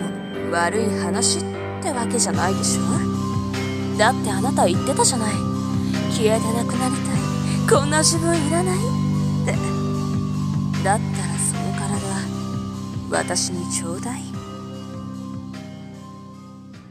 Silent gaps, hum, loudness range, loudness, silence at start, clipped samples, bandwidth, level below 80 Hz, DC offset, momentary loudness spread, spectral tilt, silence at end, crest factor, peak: none; none; 7 LU; -21 LUFS; 0 s; under 0.1%; 16 kHz; -46 dBFS; under 0.1%; 15 LU; -4.5 dB/octave; 0 s; 18 dB; -4 dBFS